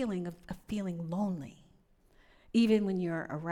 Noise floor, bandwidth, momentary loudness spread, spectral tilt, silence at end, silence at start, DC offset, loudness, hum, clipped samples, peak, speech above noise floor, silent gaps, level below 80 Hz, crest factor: -65 dBFS; 11.5 kHz; 14 LU; -7 dB/octave; 0 s; 0 s; under 0.1%; -33 LUFS; none; under 0.1%; -16 dBFS; 33 dB; none; -60 dBFS; 18 dB